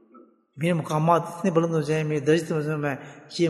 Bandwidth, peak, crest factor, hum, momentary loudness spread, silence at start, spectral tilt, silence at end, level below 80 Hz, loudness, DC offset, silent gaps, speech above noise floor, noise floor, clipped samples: 12.5 kHz; -6 dBFS; 20 dB; none; 8 LU; 0.15 s; -6.5 dB/octave; 0 s; -68 dBFS; -24 LUFS; under 0.1%; none; 30 dB; -54 dBFS; under 0.1%